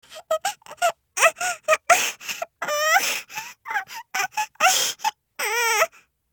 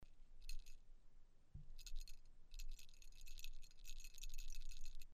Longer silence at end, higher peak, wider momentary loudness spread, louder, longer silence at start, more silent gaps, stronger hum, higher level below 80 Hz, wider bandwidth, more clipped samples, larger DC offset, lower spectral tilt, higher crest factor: first, 0.45 s vs 0 s; first, 0 dBFS vs -32 dBFS; first, 11 LU vs 7 LU; first, -22 LUFS vs -60 LUFS; about the same, 0.1 s vs 0 s; neither; neither; second, -74 dBFS vs -52 dBFS; first, over 20 kHz vs 15.5 kHz; neither; neither; second, 1.5 dB/octave vs -1.5 dB/octave; first, 24 dB vs 14 dB